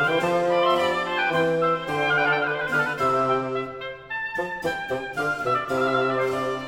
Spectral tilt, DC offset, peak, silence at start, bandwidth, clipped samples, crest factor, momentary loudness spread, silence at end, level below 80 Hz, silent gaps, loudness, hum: -5 dB/octave; under 0.1%; -8 dBFS; 0 s; 16.5 kHz; under 0.1%; 16 dB; 8 LU; 0 s; -56 dBFS; none; -23 LUFS; none